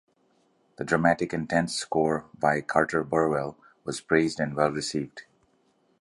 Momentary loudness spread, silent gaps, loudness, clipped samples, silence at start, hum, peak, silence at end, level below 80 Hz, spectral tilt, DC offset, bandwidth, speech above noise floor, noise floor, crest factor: 12 LU; none; -26 LUFS; under 0.1%; 0.8 s; none; -6 dBFS; 0.8 s; -58 dBFS; -5 dB/octave; under 0.1%; 11.5 kHz; 41 dB; -67 dBFS; 22 dB